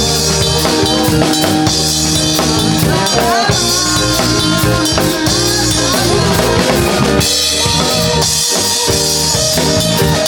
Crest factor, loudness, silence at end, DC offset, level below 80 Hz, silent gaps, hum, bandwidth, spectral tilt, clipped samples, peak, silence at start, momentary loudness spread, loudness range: 12 dB; -11 LUFS; 0 s; under 0.1%; -28 dBFS; none; none; over 20 kHz; -3 dB/octave; under 0.1%; 0 dBFS; 0 s; 1 LU; 0 LU